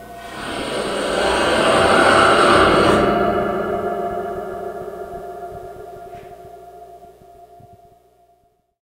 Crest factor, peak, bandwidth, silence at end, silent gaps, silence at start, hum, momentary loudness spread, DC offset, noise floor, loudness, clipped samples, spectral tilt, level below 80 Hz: 20 dB; 0 dBFS; 16 kHz; 1.35 s; none; 0 s; 60 Hz at -50 dBFS; 23 LU; under 0.1%; -61 dBFS; -16 LUFS; under 0.1%; -4 dB/octave; -42 dBFS